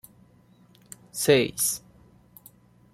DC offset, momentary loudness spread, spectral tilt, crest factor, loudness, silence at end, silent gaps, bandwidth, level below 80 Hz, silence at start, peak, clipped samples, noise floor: under 0.1%; 25 LU; -3 dB/octave; 24 dB; -24 LUFS; 1.15 s; none; 16.5 kHz; -62 dBFS; 1.15 s; -6 dBFS; under 0.1%; -57 dBFS